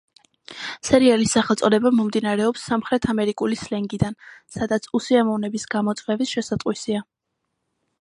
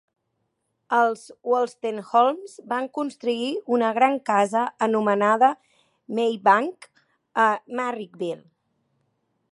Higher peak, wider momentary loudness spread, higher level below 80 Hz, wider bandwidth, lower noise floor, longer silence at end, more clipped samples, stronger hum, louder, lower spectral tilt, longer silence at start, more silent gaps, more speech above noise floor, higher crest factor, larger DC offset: about the same, -2 dBFS vs -4 dBFS; about the same, 12 LU vs 12 LU; first, -52 dBFS vs -80 dBFS; about the same, 11.5 kHz vs 11.5 kHz; about the same, -78 dBFS vs -76 dBFS; second, 1 s vs 1.15 s; neither; neither; about the same, -21 LUFS vs -23 LUFS; about the same, -5 dB/octave vs -5 dB/octave; second, 0.5 s vs 0.9 s; neither; first, 57 dB vs 53 dB; about the same, 20 dB vs 20 dB; neither